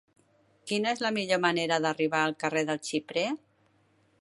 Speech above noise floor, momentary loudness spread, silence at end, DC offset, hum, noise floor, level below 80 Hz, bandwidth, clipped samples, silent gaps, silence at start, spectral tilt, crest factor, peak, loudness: 38 dB; 7 LU; 0.85 s; under 0.1%; none; -67 dBFS; -78 dBFS; 11.5 kHz; under 0.1%; none; 0.65 s; -4 dB/octave; 22 dB; -8 dBFS; -29 LUFS